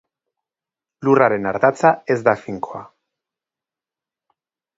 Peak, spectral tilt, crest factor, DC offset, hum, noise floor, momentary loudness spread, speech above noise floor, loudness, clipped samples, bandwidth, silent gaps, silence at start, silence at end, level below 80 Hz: 0 dBFS; -7 dB/octave; 20 dB; under 0.1%; none; -89 dBFS; 14 LU; 72 dB; -17 LUFS; under 0.1%; 7.8 kHz; none; 1 s; 1.9 s; -62 dBFS